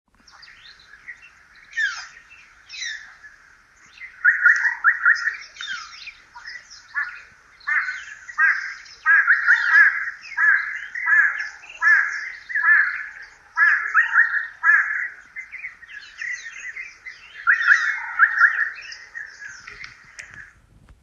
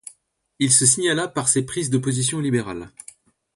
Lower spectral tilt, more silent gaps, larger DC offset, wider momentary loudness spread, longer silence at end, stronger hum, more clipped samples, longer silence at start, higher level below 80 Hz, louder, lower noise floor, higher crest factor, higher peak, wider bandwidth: second, 2 dB/octave vs -3.5 dB/octave; neither; neither; first, 23 LU vs 14 LU; about the same, 0.6 s vs 0.65 s; neither; neither; first, 1.05 s vs 0.6 s; second, -64 dBFS vs -56 dBFS; about the same, -18 LUFS vs -19 LUFS; second, -52 dBFS vs -59 dBFS; about the same, 20 dB vs 20 dB; about the same, -2 dBFS vs -2 dBFS; second, 7.6 kHz vs 11.5 kHz